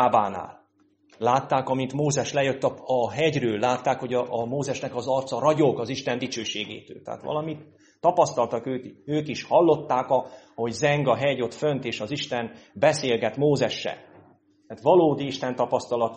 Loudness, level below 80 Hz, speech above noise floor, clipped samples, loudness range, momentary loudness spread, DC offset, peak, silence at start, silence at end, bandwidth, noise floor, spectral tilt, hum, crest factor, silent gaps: -25 LUFS; -64 dBFS; 39 dB; under 0.1%; 3 LU; 11 LU; under 0.1%; -6 dBFS; 0 s; 0 s; 8.4 kHz; -63 dBFS; -5 dB/octave; none; 18 dB; none